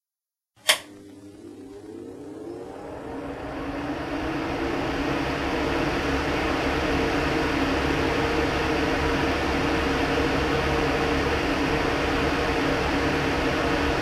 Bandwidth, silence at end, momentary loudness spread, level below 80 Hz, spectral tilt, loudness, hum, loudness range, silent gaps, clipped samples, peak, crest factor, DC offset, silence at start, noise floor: 15 kHz; 0 s; 15 LU; -36 dBFS; -5 dB/octave; -25 LUFS; none; 8 LU; none; under 0.1%; -2 dBFS; 22 dB; under 0.1%; 0.65 s; under -90 dBFS